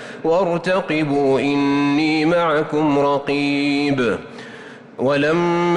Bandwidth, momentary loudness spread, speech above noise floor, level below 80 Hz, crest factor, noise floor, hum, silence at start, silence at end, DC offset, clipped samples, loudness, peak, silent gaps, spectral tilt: 10 kHz; 9 LU; 20 dB; -54 dBFS; 10 dB; -38 dBFS; none; 0 s; 0 s; under 0.1%; under 0.1%; -18 LUFS; -8 dBFS; none; -6.5 dB/octave